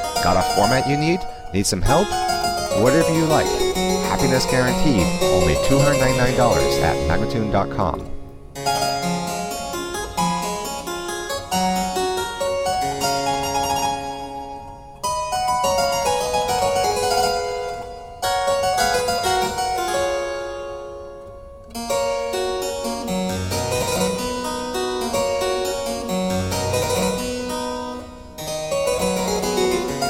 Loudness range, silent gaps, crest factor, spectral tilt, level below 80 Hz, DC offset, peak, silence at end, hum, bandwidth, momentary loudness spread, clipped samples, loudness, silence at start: 6 LU; none; 20 dB; -4 dB/octave; -36 dBFS; under 0.1%; -2 dBFS; 0 s; none; 16.5 kHz; 12 LU; under 0.1%; -21 LUFS; 0 s